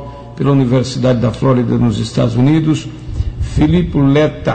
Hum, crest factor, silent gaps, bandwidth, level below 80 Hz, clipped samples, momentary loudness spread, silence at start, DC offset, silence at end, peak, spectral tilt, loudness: none; 10 dB; none; 9 kHz; -28 dBFS; under 0.1%; 9 LU; 0 s; 0.6%; 0 s; -4 dBFS; -7.5 dB/octave; -14 LUFS